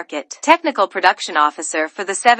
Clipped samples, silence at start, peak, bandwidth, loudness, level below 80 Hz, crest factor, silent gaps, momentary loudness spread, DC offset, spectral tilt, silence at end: under 0.1%; 0 s; 0 dBFS; 12.5 kHz; -17 LUFS; -68 dBFS; 18 dB; none; 7 LU; under 0.1%; -0.5 dB/octave; 0 s